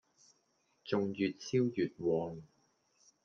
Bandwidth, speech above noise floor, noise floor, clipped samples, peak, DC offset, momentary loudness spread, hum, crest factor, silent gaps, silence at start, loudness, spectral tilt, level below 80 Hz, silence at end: 7.2 kHz; 42 dB; -76 dBFS; under 0.1%; -18 dBFS; under 0.1%; 12 LU; none; 20 dB; none; 0.85 s; -35 LUFS; -6.5 dB/octave; -76 dBFS; 0.8 s